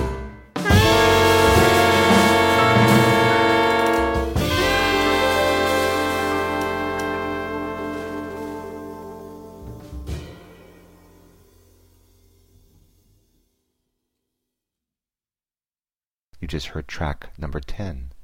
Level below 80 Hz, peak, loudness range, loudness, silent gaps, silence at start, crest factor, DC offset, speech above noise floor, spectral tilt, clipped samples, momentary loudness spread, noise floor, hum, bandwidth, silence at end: -36 dBFS; -4 dBFS; 24 LU; -18 LUFS; 16.13-16.17 s; 0 s; 18 dB; under 0.1%; over 61 dB; -4.5 dB/octave; under 0.1%; 20 LU; under -90 dBFS; none; 16.5 kHz; 0 s